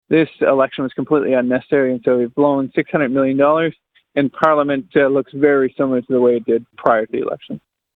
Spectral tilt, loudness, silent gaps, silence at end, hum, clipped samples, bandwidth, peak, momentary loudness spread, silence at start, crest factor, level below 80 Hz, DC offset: -9 dB/octave; -17 LUFS; none; 0.4 s; none; under 0.1%; 4.3 kHz; 0 dBFS; 8 LU; 0.1 s; 16 dB; -58 dBFS; under 0.1%